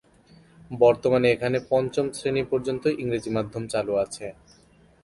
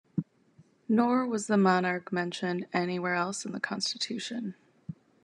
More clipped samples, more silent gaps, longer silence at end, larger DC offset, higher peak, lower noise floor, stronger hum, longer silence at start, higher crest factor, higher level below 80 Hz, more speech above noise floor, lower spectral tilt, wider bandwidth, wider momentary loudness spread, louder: neither; neither; first, 0.7 s vs 0.3 s; neither; first, -6 dBFS vs -10 dBFS; second, -57 dBFS vs -62 dBFS; neither; first, 0.7 s vs 0.15 s; about the same, 20 dB vs 20 dB; first, -56 dBFS vs -78 dBFS; about the same, 33 dB vs 33 dB; about the same, -6 dB/octave vs -5 dB/octave; about the same, 11.5 kHz vs 11 kHz; second, 9 LU vs 21 LU; first, -24 LUFS vs -29 LUFS